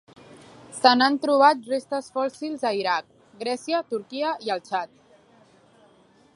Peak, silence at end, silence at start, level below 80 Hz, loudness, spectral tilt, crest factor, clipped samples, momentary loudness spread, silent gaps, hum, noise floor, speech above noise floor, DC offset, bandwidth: 0 dBFS; 1.5 s; 0.7 s; -76 dBFS; -24 LUFS; -3 dB/octave; 24 dB; under 0.1%; 12 LU; none; none; -57 dBFS; 34 dB; under 0.1%; 11.5 kHz